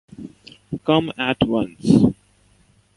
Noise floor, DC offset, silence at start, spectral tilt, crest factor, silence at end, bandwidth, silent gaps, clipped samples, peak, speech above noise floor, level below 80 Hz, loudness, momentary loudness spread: -57 dBFS; under 0.1%; 0.2 s; -7 dB/octave; 20 dB; 0.85 s; 11.5 kHz; none; under 0.1%; -2 dBFS; 39 dB; -46 dBFS; -19 LUFS; 24 LU